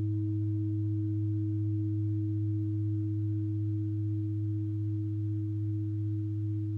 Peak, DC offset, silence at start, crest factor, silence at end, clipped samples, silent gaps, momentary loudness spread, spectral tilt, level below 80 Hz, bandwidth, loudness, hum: -24 dBFS; under 0.1%; 0 s; 6 dB; 0 s; under 0.1%; none; 2 LU; -12.5 dB/octave; -68 dBFS; 1 kHz; -33 LUFS; none